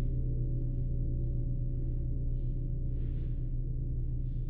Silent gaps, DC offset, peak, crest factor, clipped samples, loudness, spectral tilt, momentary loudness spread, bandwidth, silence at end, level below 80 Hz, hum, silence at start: none; under 0.1%; -22 dBFS; 10 dB; under 0.1%; -36 LUFS; -13.5 dB/octave; 3 LU; 0.8 kHz; 0 s; -34 dBFS; none; 0 s